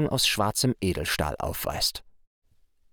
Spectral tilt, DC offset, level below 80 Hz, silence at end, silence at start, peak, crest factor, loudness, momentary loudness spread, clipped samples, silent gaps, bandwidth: -3.5 dB/octave; under 0.1%; -44 dBFS; 0.8 s; 0 s; -10 dBFS; 18 dB; -26 LUFS; 7 LU; under 0.1%; none; over 20 kHz